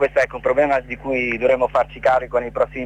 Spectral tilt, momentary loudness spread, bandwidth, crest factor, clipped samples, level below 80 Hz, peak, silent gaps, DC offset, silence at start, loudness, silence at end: -6 dB/octave; 5 LU; 9.2 kHz; 14 dB; under 0.1%; -42 dBFS; -6 dBFS; none; under 0.1%; 0 s; -19 LUFS; 0 s